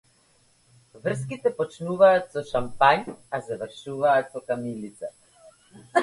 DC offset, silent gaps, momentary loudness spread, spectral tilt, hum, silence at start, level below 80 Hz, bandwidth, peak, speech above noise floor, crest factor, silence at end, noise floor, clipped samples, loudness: under 0.1%; none; 16 LU; -5.5 dB/octave; none; 0.95 s; -60 dBFS; 11.5 kHz; -4 dBFS; 38 dB; 22 dB; 0 s; -62 dBFS; under 0.1%; -25 LUFS